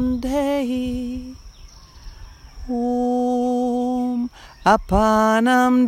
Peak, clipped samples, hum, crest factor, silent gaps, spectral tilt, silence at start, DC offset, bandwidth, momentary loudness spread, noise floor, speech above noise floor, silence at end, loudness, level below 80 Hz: -2 dBFS; under 0.1%; none; 18 dB; none; -5.5 dB/octave; 0 s; under 0.1%; 15 kHz; 13 LU; -43 dBFS; 25 dB; 0 s; -20 LUFS; -38 dBFS